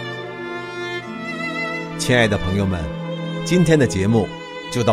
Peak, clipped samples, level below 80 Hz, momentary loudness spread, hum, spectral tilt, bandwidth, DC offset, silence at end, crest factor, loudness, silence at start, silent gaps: -2 dBFS; under 0.1%; -42 dBFS; 13 LU; none; -5.5 dB/octave; 14.5 kHz; under 0.1%; 0 s; 20 dB; -21 LUFS; 0 s; none